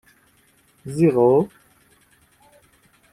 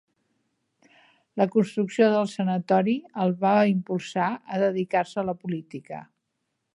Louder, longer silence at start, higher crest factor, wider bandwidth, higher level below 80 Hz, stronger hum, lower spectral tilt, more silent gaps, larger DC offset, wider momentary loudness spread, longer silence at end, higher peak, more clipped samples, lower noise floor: first, -19 LUFS vs -25 LUFS; second, 0.85 s vs 1.35 s; about the same, 18 dB vs 18 dB; first, 13.5 kHz vs 11 kHz; first, -60 dBFS vs -72 dBFS; neither; first, -9 dB/octave vs -7 dB/octave; neither; neither; first, 17 LU vs 13 LU; first, 1.65 s vs 0.7 s; first, -4 dBFS vs -8 dBFS; neither; second, -59 dBFS vs -79 dBFS